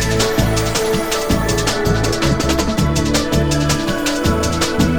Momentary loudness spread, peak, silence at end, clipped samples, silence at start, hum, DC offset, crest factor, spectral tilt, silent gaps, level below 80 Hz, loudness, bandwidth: 2 LU; -2 dBFS; 0 s; under 0.1%; 0 s; none; 0.3%; 14 dB; -4.5 dB/octave; none; -26 dBFS; -16 LUFS; over 20 kHz